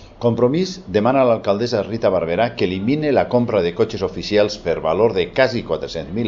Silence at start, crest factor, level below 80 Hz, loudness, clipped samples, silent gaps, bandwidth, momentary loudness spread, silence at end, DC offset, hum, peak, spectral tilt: 0 s; 18 dB; -46 dBFS; -19 LUFS; under 0.1%; none; 7.6 kHz; 5 LU; 0 s; under 0.1%; none; -2 dBFS; -6.5 dB/octave